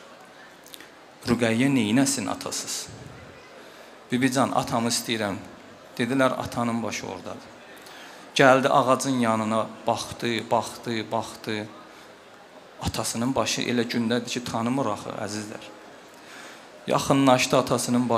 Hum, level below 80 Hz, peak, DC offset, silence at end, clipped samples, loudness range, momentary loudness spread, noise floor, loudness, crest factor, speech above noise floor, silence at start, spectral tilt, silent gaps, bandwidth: none; -58 dBFS; -2 dBFS; under 0.1%; 0 s; under 0.1%; 6 LU; 24 LU; -48 dBFS; -24 LUFS; 24 dB; 24 dB; 0 s; -4 dB/octave; none; 16 kHz